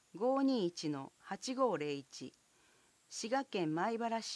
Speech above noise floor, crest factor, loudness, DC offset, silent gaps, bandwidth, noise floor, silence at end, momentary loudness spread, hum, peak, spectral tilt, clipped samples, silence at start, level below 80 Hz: 33 dB; 16 dB; -37 LUFS; under 0.1%; none; 11 kHz; -70 dBFS; 0 s; 14 LU; none; -22 dBFS; -4.5 dB/octave; under 0.1%; 0.15 s; -88 dBFS